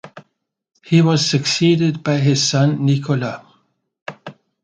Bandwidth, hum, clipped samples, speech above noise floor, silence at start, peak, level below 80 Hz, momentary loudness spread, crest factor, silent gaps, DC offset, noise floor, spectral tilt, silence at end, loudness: 9.2 kHz; none; under 0.1%; 52 dB; 0.05 s; 0 dBFS; -58 dBFS; 20 LU; 18 dB; 4.02-4.06 s; under 0.1%; -67 dBFS; -5 dB/octave; 0.3 s; -16 LUFS